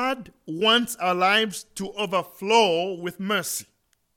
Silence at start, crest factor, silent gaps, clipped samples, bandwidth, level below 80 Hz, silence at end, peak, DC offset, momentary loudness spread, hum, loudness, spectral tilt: 0 s; 18 dB; none; under 0.1%; 17.5 kHz; -66 dBFS; 0.55 s; -6 dBFS; under 0.1%; 13 LU; none; -23 LUFS; -3 dB/octave